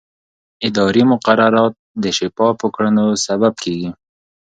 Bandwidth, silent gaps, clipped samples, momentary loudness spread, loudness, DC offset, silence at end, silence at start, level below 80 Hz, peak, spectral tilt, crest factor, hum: 9.2 kHz; 1.79-1.95 s; under 0.1%; 10 LU; -16 LUFS; under 0.1%; 0.6 s; 0.6 s; -54 dBFS; 0 dBFS; -5 dB/octave; 16 dB; none